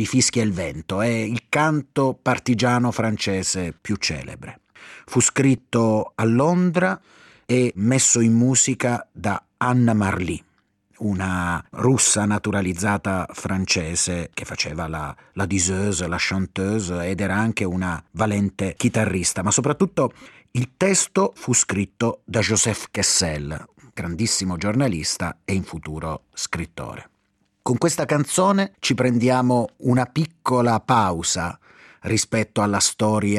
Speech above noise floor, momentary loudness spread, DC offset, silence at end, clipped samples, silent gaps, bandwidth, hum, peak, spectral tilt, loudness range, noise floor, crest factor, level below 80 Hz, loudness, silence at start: 46 dB; 11 LU; under 0.1%; 0 s; under 0.1%; none; 14 kHz; none; -6 dBFS; -4 dB/octave; 5 LU; -68 dBFS; 16 dB; -50 dBFS; -21 LUFS; 0 s